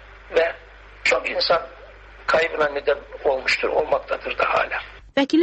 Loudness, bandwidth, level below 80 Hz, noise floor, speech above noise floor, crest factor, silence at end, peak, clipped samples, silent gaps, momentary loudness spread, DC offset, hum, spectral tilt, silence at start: -22 LUFS; 8.4 kHz; -48 dBFS; -44 dBFS; 23 dB; 16 dB; 0 s; -6 dBFS; under 0.1%; none; 7 LU; under 0.1%; none; -3.5 dB/octave; 0 s